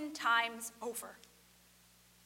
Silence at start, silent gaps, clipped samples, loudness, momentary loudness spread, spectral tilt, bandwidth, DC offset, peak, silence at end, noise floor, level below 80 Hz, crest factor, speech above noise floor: 0 s; none; under 0.1%; -35 LUFS; 14 LU; -0.5 dB/octave; 16 kHz; under 0.1%; -18 dBFS; 1.1 s; -65 dBFS; -78 dBFS; 22 dB; 28 dB